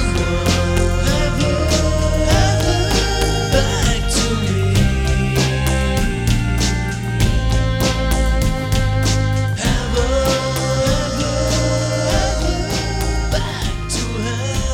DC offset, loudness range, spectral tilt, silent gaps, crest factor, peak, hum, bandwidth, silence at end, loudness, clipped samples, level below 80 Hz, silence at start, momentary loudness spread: under 0.1%; 2 LU; -4.5 dB/octave; none; 16 dB; 0 dBFS; none; 17.5 kHz; 0 s; -18 LUFS; under 0.1%; -22 dBFS; 0 s; 4 LU